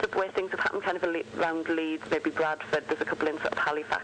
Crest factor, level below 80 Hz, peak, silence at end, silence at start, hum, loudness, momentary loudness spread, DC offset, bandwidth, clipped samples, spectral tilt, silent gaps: 12 dB; -64 dBFS; -18 dBFS; 0 s; 0 s; none; -29 LUFS; 2 LU; under 0.1%; 9.6 kHz; under 0.1%; -4.5 dB/octave; none